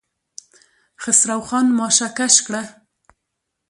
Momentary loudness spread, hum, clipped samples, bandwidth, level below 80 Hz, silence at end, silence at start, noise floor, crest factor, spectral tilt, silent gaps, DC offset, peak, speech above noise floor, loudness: 14 LU; none; under 0.1%; 11.5 kHz; -64 dBFS; 1 s; 1 s; -78 dBFS; 20 dB; -1 dB/octave; none; under 0.1%; 0 dBFS; 60 dB; -16 LUFS